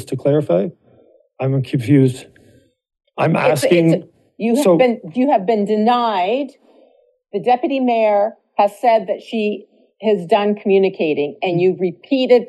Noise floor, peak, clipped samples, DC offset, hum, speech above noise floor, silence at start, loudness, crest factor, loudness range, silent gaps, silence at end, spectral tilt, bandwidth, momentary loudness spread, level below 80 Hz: -55 dBFS; -2 dBFS; under 0.1%; under 0.1%; none; 39 dB; 0 s; -17 LUFS; 16 dB; 2 LU; none; 0.05 s; -7 dB/octave; 12.5 kHz; 9 LU; -68 dBFS